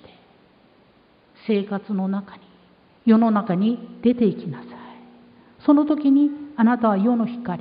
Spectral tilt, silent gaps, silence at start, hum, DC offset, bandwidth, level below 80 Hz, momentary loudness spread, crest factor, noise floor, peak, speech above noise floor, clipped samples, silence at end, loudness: -12 dB/octave; none; 1.45 s; none; under 0.1%; 5 kHz; -66 dBFS; 14 LU; 16 dB; -56 dBFS; -6 dBFS; 37 dB; under 0.1%; 0 s; -21 LUFS